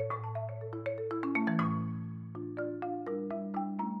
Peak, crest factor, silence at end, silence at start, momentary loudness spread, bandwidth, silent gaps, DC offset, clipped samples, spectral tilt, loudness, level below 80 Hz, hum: -18 dBFS; 16 dB; 0 s; 0 s; 9 LU; 5.8 kHz; none; under 0.1%; under 0.1%; -10 dB/octave; -36 LUFS; -78 dBFS; none